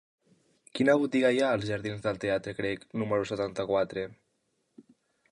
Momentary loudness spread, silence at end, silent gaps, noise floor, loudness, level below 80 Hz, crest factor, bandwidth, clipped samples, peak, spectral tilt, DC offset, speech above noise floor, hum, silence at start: 9 LU; 1.2 s; none; -76 dBFS; -29 LUFS; -62 dBFS; 18 dB; 11.5 kHz; under 0.1%; -12 dBFS; -6 dB/octave; under 0.1%; 48 dB; none; 0.75 s